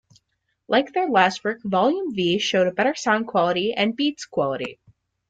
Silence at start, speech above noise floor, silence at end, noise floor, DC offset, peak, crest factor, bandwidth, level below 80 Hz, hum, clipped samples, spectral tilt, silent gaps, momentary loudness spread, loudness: 0.7 s; 52 dB; 0.55 s; -74 dBFS; under 0.1%; -2 dBFS; 20 dB; 9.2 kHz; -64 dBFS; none; under 0.1%; -4.5 dB/octave; none; 7 LU; -22 LUFS